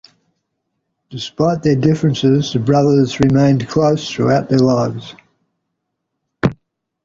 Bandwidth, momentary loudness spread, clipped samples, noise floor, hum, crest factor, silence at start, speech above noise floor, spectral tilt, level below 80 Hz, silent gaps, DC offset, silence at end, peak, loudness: 7.6 kHz; 9 LU; under 0.1%; -75 dBFS; none; 16 dB; 1.1 s; 61 dB; -7 dB/octave; -46 dBFS; none; under 0.1%; 0.5 s; 0 dBFS; -15 LUFS